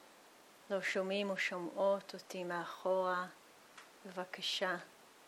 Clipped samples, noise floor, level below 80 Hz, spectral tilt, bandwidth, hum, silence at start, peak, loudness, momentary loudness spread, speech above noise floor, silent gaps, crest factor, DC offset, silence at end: under 0.1%; -62 dBFS; under -90 dBFS; -3.5 dB/octave; 15.5 kHz; none; 0 s; -22 dBFS; -38 LUFS; 17 LU; 24 dB; none; 18 dB; under 0.1%; 0 s